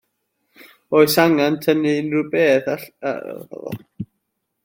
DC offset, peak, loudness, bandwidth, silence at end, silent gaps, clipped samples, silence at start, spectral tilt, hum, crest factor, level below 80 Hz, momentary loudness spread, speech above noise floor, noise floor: under 0.1%; -2 dBFS; -18 LUFS; 17 kHz; 0.6 s; none; under 0.1%; 0.9 s; -5 dB/octave; none; 18 dB; -64 dBFS; 18 LU; 57 dB; -75 dBFS